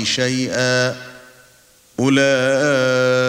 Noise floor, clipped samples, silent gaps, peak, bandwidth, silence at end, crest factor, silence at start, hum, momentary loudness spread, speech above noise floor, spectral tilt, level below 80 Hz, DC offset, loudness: -51 dBFS; under 0.1%; none; -2 dBFS; 16 kHz; 0 s; 16 dB; 0 s; none; 15 LU; 35 dB; -4 dB/octave; -60 dBFS; under 0.1%; -17 LUFS